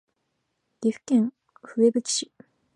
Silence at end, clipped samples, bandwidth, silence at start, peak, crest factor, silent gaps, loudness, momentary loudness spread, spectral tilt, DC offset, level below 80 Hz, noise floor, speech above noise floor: 0.5 s; under 0.1%; 11 kHz; 0.8 s; -8 dBFS; 18 dB; none; -25 LUFS; 10 LU; -4 dB/octave; under 0.1%; -78 dBFS; -77 dBFS; 53 dB